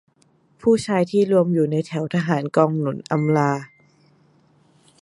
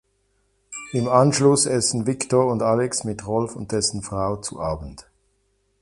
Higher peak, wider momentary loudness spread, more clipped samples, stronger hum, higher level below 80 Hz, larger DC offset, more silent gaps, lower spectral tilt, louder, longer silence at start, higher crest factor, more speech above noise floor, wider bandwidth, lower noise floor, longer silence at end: about the same, -2 dBFS vs -2 dBFS; second, 6 LU vs 11 LU; neither; neither; second, -62 dBFS vs -48 dBFS; neither; neither; first, -7.5 dB/octave vs -4.5 dB/octave; about the same, -20 LUFS vs -21 LUFS; about the same, 0.65 s vs 0.7 s; about the same, 20 dB vs 20 dB; second, 41 dB vs 46 dB; about the same, 11.5 kHz vs 11.5 kHz; second, -60 dBFS vs -68 dBFS; first, 1.35 s vs 0.8 s